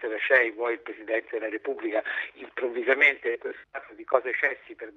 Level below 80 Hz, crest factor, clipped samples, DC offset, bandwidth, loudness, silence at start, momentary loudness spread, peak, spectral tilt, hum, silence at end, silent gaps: -74 dBFS; 22 dB; under 0.1%; under 0.1%; 6.8 kHz; -26 LUFS; 0 s; 16 LU; -6 dBFS; -3.5 dB/octave; none; 0.05 s; none